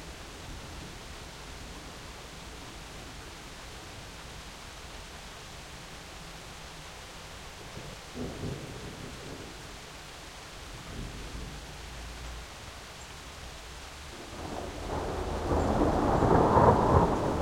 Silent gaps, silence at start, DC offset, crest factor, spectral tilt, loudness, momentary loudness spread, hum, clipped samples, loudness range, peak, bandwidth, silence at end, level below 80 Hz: none; 0 s; under 0.1%; 24 dB; -6 dB/octave; -32 LUFS; 19 LU; none; under 0.1%; 16 LU; -8 dBFS; 16 kHz; 0 s; -44 dBFS